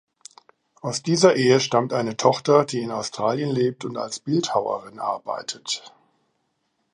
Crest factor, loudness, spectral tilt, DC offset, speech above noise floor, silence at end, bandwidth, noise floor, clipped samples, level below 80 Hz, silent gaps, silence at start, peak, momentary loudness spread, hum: 22 dB; -22 LUFS; -4.5 dB/octave; under 0.1%; 51 dB; 1.05 s; 11 kHz; -73 dBFS; under 0.1%; -70 dBFS; none; 0.85 s; -2 dBFS; 12 LU; none